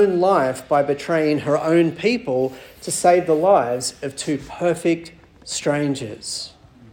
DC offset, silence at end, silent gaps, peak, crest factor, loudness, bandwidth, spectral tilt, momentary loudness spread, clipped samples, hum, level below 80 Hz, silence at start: under 0.1%; 0.45 s; none; -2 dBFS; 18 dB; -20 LUFS; 17.5 kHz; -4.5 dB/octave; 12 LU; under 0.1%; none; -56 dBFS; 0 s